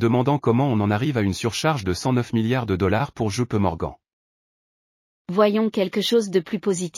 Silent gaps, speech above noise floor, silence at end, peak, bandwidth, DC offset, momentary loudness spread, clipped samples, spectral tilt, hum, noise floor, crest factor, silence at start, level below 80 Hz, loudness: 4.13-5.25 s; over 69 dB; 0 s; -6 dBFS; 14.5 kHz; under 0.1%; 5 LU; under 0.1%; -6 dB/octave; none; under -90 dBFS; 16 dB; 0 s; -50 dBFS; -22 LUFS